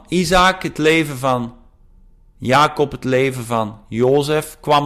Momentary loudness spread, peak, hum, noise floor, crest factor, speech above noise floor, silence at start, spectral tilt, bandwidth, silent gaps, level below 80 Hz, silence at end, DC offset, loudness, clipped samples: 9 LU; -4 dBFS; none; -47 dBFS; 12 dB; 31 dB; 0.1 s; -5 dB/octave; 16 kHz; none; -40 dBFS; 0 s; under 0.1%; -17 LUFS; under 0.1%